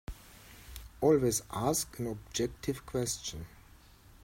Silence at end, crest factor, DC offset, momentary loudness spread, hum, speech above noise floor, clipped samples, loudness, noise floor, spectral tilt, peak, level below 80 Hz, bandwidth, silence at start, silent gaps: 0.75 s; 20 dB; under 0.1%; 23 LU; none; 25 dB; under 0.1%; -32 LUFS; -57 dBFS; -4.5 dB/octave; -14 dBFS; -52 dBFS; 16.5 kHz; 0.1 s; none